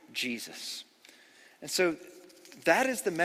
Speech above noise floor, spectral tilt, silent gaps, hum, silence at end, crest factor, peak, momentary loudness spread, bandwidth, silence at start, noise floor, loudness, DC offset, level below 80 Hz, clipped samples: 28 dB; -2.5 dB/octave; none; none; 0 s; 24 dB; -10 dBFS; 24 LU; 16 kHz; 0.1 s; -58 dBFS; -30 LUFS; under 0.1%; -76 dBFS; under 0.1%